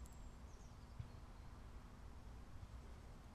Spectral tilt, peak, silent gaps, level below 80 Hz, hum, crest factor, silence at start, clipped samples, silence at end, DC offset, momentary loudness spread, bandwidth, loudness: -6 dB/octave; -38 dBFS; none; -58 dBFS; none; 18 dB; 0 s; under 0.1%; 0 s; under 0.1%; 3 LU; 13 kHz; -59 LUFS